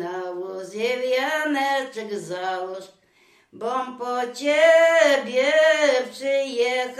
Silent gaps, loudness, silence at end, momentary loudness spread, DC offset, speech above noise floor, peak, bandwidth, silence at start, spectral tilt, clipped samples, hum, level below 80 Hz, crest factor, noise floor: none; -21 LUFS; 0 s; 15 LU; under 0.1%; 38 dB; -4 dBFS; 13.5 kHz; 0 s; -2.5 dB/octave; under 0.1%; none; -78 dBFS; 18 dB; -59 dBFS